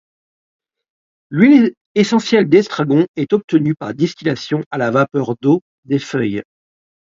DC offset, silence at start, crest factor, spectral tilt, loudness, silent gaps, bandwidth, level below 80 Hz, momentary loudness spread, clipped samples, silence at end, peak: under 0.1%; 1.3 s; 16 dB; -6.5 dB/octave; -16 LUFS; 1.77-1.95 s, 3.08-3.14 s, 3.44-3.48 s, 4.66-4.71 s, 5.62-5.83 s; 7.8 kHz; -60 dBFS; 10 LU; under 0.1%; 0.75 s; 0 dBFS